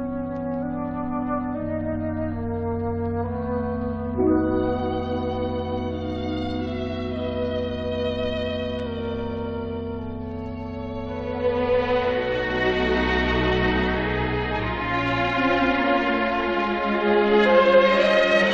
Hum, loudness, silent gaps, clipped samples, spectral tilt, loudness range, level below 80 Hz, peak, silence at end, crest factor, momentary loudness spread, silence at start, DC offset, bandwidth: none; -24 LUFS; none; under 0.1%; -7 dB/octave; 7 LU; -38 dBFS; -6 dBFS; 0 s; 18 dB; 11 LU; 0 s; under 0.1%; 8 kHz